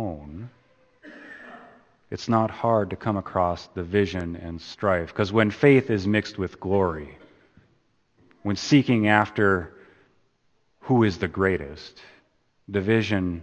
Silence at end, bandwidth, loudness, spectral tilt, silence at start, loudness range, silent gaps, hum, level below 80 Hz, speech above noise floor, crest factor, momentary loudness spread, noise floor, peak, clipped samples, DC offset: 0 s; 8.8 kHz; -23 LUFS; -6.5 dB/octave; 0 s; 4 LU; none; none; -52 dBFS; 43 dB; 22 dB; 23 LU; -66 dBFS; -2 dBFS; under 0.1%; under 0.1%